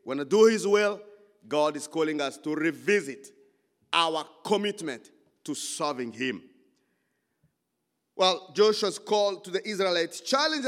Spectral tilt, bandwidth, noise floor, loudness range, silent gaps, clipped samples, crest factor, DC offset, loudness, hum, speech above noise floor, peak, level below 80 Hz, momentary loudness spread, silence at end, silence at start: -3 dB/octave; 14.5 kHz; -80 dBFS; 7 LU; none; under 0.1%; 22 dB; under 0.1%; -27 LUFS; none; 53 dB; -6 dBFS; -90 dBFS; 14 LU; 0 s; 0.05 s